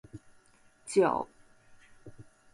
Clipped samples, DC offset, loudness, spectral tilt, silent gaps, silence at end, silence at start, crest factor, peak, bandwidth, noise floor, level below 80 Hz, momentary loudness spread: under 0.1%; under 0.1%; -29 LUFS; -5 dB/octave; none; 0.3 s; 0.15 s; 20 dB; -14 dBFS; 11.5 kHz; -63 dBFS; -66 dBFS; 27 LU